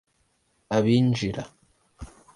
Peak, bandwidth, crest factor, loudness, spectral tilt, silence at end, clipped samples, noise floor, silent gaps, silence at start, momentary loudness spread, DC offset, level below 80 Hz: -8 dBFS; 11 kHz; 18 dB; -24 LUFS; -7 dB/octave; 0.3 s; under 0.1%; -69 dBFS; none; 0.7 s; 25 LU; under 0.1%; -52 dBFS